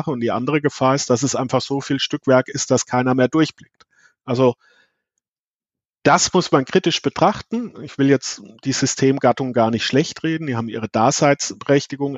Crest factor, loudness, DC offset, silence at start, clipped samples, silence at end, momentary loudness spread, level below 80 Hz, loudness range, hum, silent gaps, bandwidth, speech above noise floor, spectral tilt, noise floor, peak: 18 dB; -19 LUFS; under 0.1%; 0 s; under 0.1%; 0 s; 8 LU; -58 dBFS; 3 LU; none; 5.29-5.60 s, 5.89-5.93 s; 8.2 kHz; over 71 dB; -4.5 dB/octave; under -90 dBFS; -2 dBFS